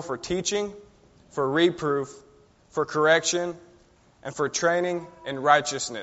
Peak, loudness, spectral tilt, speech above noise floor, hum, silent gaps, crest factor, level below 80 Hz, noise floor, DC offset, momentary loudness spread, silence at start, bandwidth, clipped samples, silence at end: -6 dBFS; -25 LUFS; -2.5 dB/octave; 33 dB; none; none; 22 dB; -60 dBFS; -58 dBFS; under 0.1%; 15 LU; 0 s; 8 kHz; under 0.1%; 0 s